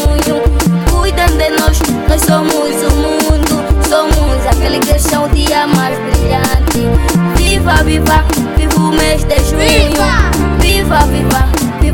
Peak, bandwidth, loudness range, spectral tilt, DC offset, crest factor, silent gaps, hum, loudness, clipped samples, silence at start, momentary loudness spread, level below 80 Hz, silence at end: 0 dBFS; 18 kHz; 1 LU; -5 dB/octave; under 0.1%; 10 dB; none; none; -11 LUFS; under 0.1%; 0 s; 3 LU; -14 dBFS; 0 s